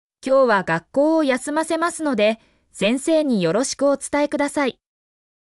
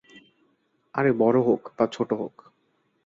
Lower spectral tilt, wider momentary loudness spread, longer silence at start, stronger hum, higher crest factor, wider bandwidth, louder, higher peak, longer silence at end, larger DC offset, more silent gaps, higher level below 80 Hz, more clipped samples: second, -4.5 dB/octave vs -7.5 dB/octave; second, 5 LU vs 12 LU; second, 0.25 s vs 0.95 s; neither; second, 14 dB vs 20 dB; first, 12 kHz vs 7.6 kHz; first, -20 LUFS vs -24 LUFS; about the same, -8 dBFS vs -6 dBFS; about the same, 0.85 s vs 0.75 s; neither; neither; first, -60 dBFS vs -68 dBFS; neither